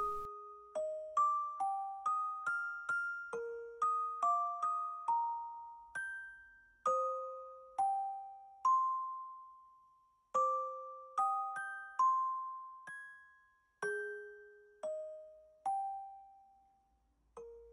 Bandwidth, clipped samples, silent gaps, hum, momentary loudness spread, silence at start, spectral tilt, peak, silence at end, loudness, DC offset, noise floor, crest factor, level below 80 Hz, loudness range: 11 kHz; under 0.1%; none; none; 18 LU; 0 s; -2.5 dB/octave; -24 dBFS; 0 s; -38 LUFS; under 0.1%; -75 dBFS; 14 dB; -74 dBFS; 7 LU